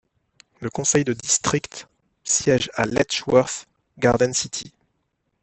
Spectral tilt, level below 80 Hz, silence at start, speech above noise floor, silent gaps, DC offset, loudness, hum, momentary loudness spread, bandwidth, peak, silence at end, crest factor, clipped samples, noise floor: -3.5 dB/octave; -54 dBFS; 0.6 s; 51 dB; none; under 0.1%; -21 LUFS; none; 15 LU; 8.6 kHz; -2 dBFS; 0.75 s; 22 dB; under 0.1%; -73 dBFS